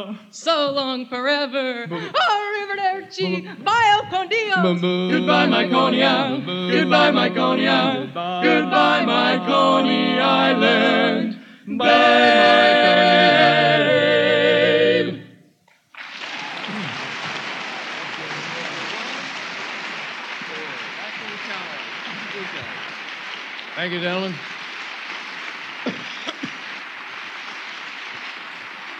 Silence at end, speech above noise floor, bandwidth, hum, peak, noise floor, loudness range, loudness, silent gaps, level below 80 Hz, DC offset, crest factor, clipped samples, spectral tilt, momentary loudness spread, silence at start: 0 s; 40 dB; 9.4 kHz; none; -2 dBFS; -57 dBFS; 14 LU; -19 LUFS; none; -74 dBFS; under 0.1%; 18 dB; under 0.1%; -5 dB/octave; 17 LU; 0 s